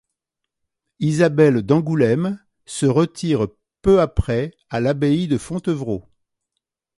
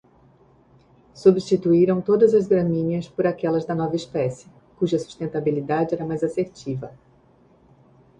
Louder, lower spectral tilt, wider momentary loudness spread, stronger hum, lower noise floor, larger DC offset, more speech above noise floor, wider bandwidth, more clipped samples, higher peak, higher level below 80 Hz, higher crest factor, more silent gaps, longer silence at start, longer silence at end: first, -19 LUFS vs -22 LUFS; about the same, -7 dB/octave vs -8 dB/octave; about the same, 11 LU vs 11 LU; neither; first, -82 dBFS vs -56 dBFS; neither; first, 64 dB vs 35 dB; first, 11.5 kHz vs 9.4 kHz; neither; about the same, -2 dBFS vs -4 dBFS; first, -38 dBFS vs -58 dBFS; about the same, 18 dB vs 20 dB; neither; second, 1 s vs 1.15 s; second, 0.95 s vs 1.3 s